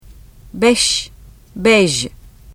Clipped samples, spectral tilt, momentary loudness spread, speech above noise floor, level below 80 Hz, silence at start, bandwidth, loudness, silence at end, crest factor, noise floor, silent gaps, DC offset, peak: under 0.1%; -3 dB/octave; 22 LU; 26 dB; -40 dBFS; 0.1 s; 15 kHz; -14 LUFS; 0 s; 18 dB; -40 dBFS; none; under 0.1%; 0 dBFS